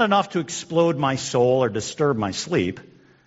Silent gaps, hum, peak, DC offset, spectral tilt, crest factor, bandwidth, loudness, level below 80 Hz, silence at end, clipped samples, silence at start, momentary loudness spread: none; none; -4 dBFS; under 0.1%; -4.5 dB/octave; 18 dB; 8 kHz; -22 LUFS; -60 dBFS; 0.45 s; under 0.1%; 0 s; 7 LU